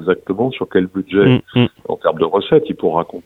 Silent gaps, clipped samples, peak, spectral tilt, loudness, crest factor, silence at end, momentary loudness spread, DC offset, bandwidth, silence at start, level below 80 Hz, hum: none; under 0.1%; 0 dBFS; -9 dB/octave; -16 LUFS; 16 dB; 0.05 s; 6 LU; under 0.1%; 4.2 kHz; 0 s; -50 dBFS; none